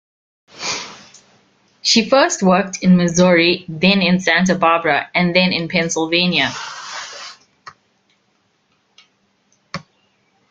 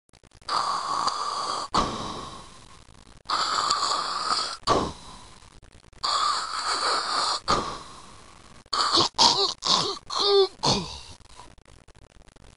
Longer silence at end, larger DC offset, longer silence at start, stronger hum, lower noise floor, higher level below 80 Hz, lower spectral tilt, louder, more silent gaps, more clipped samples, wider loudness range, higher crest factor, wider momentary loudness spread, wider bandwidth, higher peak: about the same, 0.7 s vs 0.65 s; second, under 0.1% vs 0.2%; about the same, 0.55 s vs 0.45 s; neither; first, -63 dBFS vs -51 dBFS; about the same, -54 dBFS vs -50 dBFS; first, -4.5 dB/octave vs -2 dB/octave; first, -15 LUFS vs -24 LUFS; neither; neither; first, 10 LU vs 5 LU; second, 18 dB vs 26 dB; about the same, 19 LU vs 17 LU; second, 7.8 kHz vs 11.5 kHz; about the same, 0 dBFS vs -2 dBFS